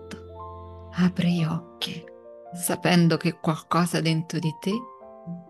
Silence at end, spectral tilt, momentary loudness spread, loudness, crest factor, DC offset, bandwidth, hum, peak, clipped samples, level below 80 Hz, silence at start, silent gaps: 0.05 s; -5.5 dB/octave; 20 LU; -25 LUFS; 18 dB; under 0.1%; 12.5 kHz; none; -8 dBFS; under 0.1%; -60 dBFS; 0 s; none